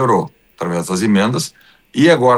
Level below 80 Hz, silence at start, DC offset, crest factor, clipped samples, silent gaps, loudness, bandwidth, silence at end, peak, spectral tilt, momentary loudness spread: -56 dBFS; 0 s; under 0.1%; 14 dB; under 0.1%; none; -16 LUFS; 12.5 kHz; 0 s; 0 dBFS; -5.5 dB/octave; 13 LU